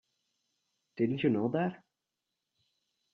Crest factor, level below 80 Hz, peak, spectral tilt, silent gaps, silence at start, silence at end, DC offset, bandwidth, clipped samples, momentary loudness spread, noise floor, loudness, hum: 20 dB; -76 dBFS; -16 dBFS; -9.5 dB/octave; none; 0.95 s; 1.4 s; under 0.1%; 6.4 kHz; under 0.1%; 7 LU; -87 dBFS; -32 LUFS; none